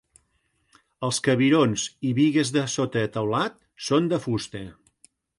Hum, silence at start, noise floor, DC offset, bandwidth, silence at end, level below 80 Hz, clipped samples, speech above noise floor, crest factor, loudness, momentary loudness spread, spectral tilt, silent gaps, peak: none; 1 s; -70 dBFS; under 0.1%; 11.5 kHz; 0.7 s; -60 dBFS; under 0.1%; 47 dB; 16 dB; -24 LUFS; 12 LU; -5 dB/octave; none; -8 dBFS